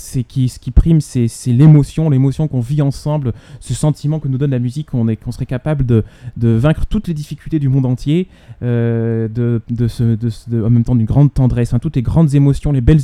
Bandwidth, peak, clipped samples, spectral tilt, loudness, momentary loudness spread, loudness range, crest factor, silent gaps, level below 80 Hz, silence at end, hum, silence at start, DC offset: 12 kHz; 0 dBFS; 0.1%; -8.5 dB/octave; -15 LUFS; 9 LU; 4 LU; 14 dB; none; -26 dBFS; 0 s; none; 0 s; under 0.1%